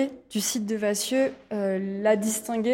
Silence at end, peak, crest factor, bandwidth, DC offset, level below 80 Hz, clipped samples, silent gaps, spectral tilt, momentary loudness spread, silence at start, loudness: 0 s; -10 dBFS; 16 dB; 16.5 kHz; under 0.1%; -68 dBFS; under 0.1%; none; -4 dB/octave; 5 LU; 0 s; -26 LUFS